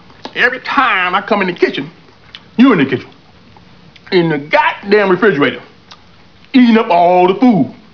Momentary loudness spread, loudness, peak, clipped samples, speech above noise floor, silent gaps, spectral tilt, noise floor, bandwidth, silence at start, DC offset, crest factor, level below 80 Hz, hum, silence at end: 9 LU; -12 LUFS; 0 dBFS; under 0.1%; 33 dB; none; -7 dB/octave; -44 dBFS; 5.4 kHz; 0.25 s; 0.4%; 14 dB; -54 dBFS; none; 0.2 s